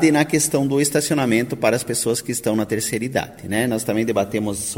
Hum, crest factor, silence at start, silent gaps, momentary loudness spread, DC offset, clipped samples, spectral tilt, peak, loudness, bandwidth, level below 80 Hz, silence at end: none; 16 dB; 0 s; none; 5 LU; under 0.1%; under 0.1%; -4.5 dB/octave; -4 dBFS; -20 LUFS; 16.5 kHz; -52 dBFS; 0 s